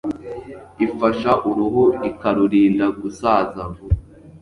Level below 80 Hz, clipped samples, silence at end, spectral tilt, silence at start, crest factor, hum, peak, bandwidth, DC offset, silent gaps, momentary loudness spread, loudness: -36 dBFS; under 0.1%; 0.05 s; -8 dB/octave; 0.05 s; 16 dB; none; -2 dBFS; 11 kHz; under 0.1%; none; 15 LU; -19 LUFS